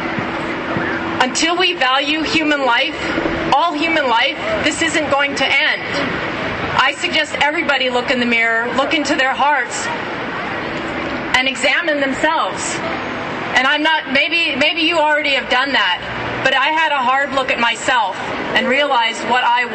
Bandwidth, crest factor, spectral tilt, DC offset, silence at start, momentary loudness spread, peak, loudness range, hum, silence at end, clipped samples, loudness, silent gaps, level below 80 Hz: 10 kHz; 16 dB; -2.5 dB/octave; under 0.1%; 0 s; 8 LU; -2 dBFS; 3 LU; none; 0 s; under 0.1%; -16 LUFS; none; -46 dBFS